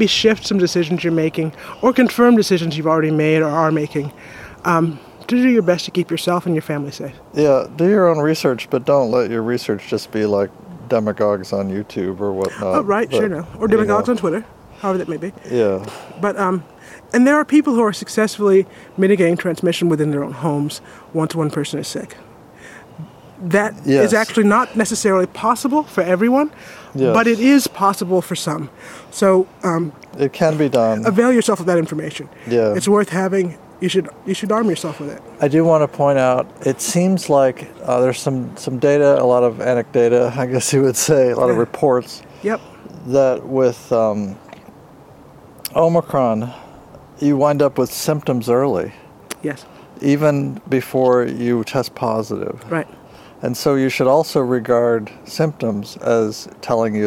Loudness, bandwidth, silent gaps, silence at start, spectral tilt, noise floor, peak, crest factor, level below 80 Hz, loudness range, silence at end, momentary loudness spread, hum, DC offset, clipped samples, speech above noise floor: -17 LUFS; 16.5 kHz; none; 0 s; -5.5 dB/octave; -43 dBFS; 0 dBFS; 16 dB; -56 dBFS; 4 LU; 0 s; 12 LU; none; under 0.1%; under 0.1%; 26 dB